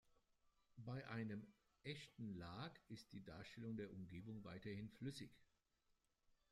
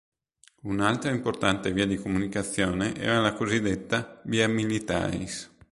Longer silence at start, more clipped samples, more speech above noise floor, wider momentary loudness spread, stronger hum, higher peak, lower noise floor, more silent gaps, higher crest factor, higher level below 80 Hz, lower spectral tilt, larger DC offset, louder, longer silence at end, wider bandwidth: second, 0.05 s vs 0.65 s; neither; second, 32 dB vs 36 dB; about the same, 8 LU vs 6 LU; neither; second, -38 dBFS vs -6 dBFS; first, -86 dBFS vs -62 dBFS; neither; about the same, 18 dB vs 22 dB; second, -78 dBFS vs -50 dBFS; first, -6.5 dB/octave vs -5 dB/octave; neither; second, -55 LUFS vs -27 LUFS; about the same, 0.2 s vs 0.25 s; first, 13.5 kHz vs 11.5 kHz